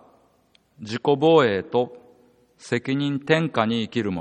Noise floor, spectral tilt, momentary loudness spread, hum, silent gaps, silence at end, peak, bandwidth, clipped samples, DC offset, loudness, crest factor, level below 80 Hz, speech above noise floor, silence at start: -62 dBFS; -6.5 dB/octave; 12 LU; none; none; 0 s; -4 dBFS; 9.4 kHz; under 0.1%; under 0.1%; -22 LUFS; 20 dB; -66 dBFS; 40 dB; 0.8 s